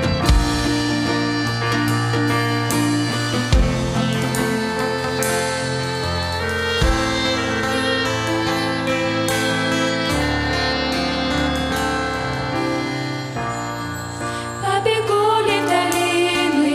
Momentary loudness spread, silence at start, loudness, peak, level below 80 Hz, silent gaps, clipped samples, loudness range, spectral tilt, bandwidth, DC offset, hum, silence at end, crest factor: 5 LU; 0 s; -20 LUFS; -2 dBFS; -30 dBFS; none; under 0.1%; 3 LU; -4.5 dB/octave; 15.5 kHz; under 0.1%; none; 0 s; 18 dB